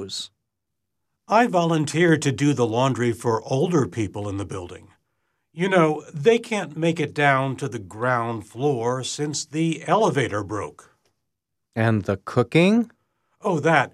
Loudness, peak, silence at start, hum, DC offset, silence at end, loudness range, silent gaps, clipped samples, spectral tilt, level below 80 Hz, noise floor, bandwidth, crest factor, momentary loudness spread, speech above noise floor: -22 LUFS; -4 dBFS; 0 s; none; under 0.1%; 0.05 s; 4 LU; none; under 0.1%; -5.5 dB/octave; -62 dBFS; -81 dBFS; 13 kHz; 18 dB; 12 LU; 60 dB